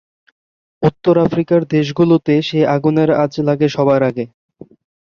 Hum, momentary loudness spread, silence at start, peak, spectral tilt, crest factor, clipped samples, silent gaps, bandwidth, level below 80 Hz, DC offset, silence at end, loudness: none; 5 LU; 0.8 s; 0 dBFS; -8 dB/octave; 14 dB; under 0.1%; none; 7 kHz; -52 dBFS; under 0.1%; 0.9 s; -15 LUFS